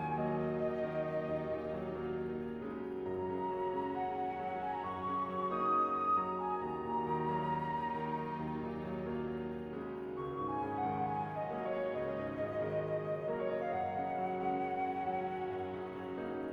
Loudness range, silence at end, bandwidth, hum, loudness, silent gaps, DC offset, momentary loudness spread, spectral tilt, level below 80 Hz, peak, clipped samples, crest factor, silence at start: 4 LU; 0 s; 6.6 kHz; none; -37 LUFS; none; under 0.1%; 6 LU; -9 dB/octave; -64 dBFS; -22 dBFS; under 0.1%; 14 dB; 0 s